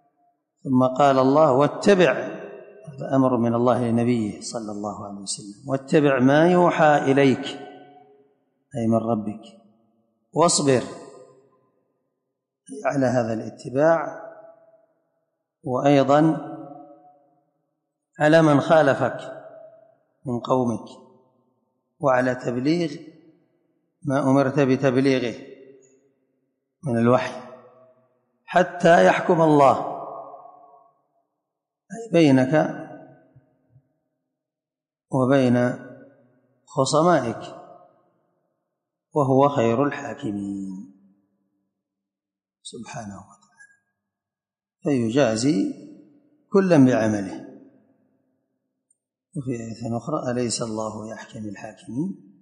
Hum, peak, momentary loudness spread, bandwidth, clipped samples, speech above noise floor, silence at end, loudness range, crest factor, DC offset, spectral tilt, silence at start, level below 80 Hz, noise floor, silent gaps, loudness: none; -4 dBFS; 21 LU; 10.5 kHz; under 0.1%; over 70 dB; 0.25 s; 9 LU; 18 dB; under 0.1%; -6 dB/octave; 0.65 s; -64 dBFS; under -90 dBFS; none; -21 LUFS